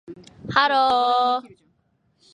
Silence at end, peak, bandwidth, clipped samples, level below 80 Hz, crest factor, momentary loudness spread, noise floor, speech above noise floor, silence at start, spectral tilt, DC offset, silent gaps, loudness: 0.85 s; -2 dBFS; 9.8 kHz; under 0.1%; -60 dBFS; 20 dB; 9 LU; -67 dBFS; 47 dB; 0.1 s; -4.5 dB/octave; under 0.1%; none; -20 LUFS